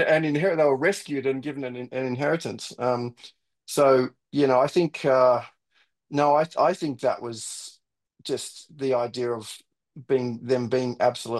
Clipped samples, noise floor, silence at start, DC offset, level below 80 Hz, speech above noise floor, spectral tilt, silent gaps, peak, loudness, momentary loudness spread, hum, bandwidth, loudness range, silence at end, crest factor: under 0.1%; -68 dBFS; 0 s; under 0.1%; -74 dBFS; 44 dB; -5.5 dB/octave; none; -8 dBFS; -25 LUFS; 13 LU; none; 12.5 kHz; 7 LU; 0 s; 18 dB